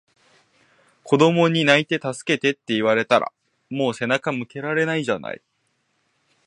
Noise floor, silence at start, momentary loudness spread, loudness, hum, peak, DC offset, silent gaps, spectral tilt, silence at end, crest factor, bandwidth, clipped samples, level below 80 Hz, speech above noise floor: -70 dBFS; 1.05 s; 11 LU; -20 LUFS; none; 0 dBFS; under 0.1%; none; -5 dB/octave; 1.1 s; 22 dB; 11 kHz; under 0.1%; -68 dBFS; 49 dB